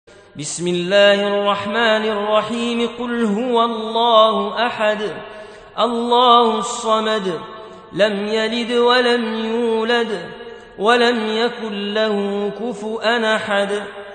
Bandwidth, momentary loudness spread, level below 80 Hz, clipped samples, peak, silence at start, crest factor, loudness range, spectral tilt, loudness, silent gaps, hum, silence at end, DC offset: 9.4 kHz; 13 LU; -58 dBFS; under 0.1%; 0 dBFS; 0.35 s; 18 dB; 3 LU; -4 dB/octave; -17 LUFS; none; none; 0 s; under 0.1%